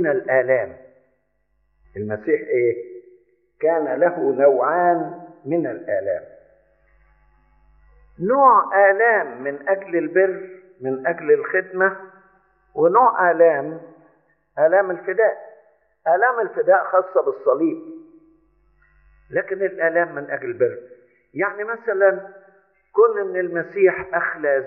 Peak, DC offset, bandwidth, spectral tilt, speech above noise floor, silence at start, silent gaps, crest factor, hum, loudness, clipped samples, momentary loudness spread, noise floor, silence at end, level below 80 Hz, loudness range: -2 dBFS; under 0.1%; 3 kHz; -7.5 dB/octave; 49 dB; 0 s; none; 18 dB; none; -19 LUFS; under 0.1%; 16 LU; -68 dBFS; 0 s; -64 dBFS; 7 LU